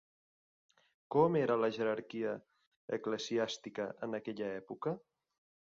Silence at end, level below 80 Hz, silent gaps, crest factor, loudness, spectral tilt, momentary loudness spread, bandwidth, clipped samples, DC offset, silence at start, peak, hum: 0.7 s; -78 dBFS; 2.67-2.88 s; 22 dB; -36 LUFS; -4.5 dB/octave; 11 LU; 7.4 kHz; under 0.1%; under 0.1%; 1.1 s; -16 dBFS; none